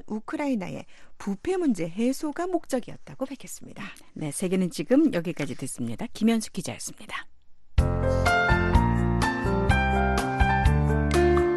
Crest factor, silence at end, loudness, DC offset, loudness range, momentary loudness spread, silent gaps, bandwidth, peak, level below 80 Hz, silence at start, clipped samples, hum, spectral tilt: 20 dB; 0 s; -26 LUFS; under 0.1%; 7 LU; 15 LU; none; 12.5 kHz; -6 dBFS; -32 dBFS; 0.05 s; under 0.1%; none; -6 dB/octave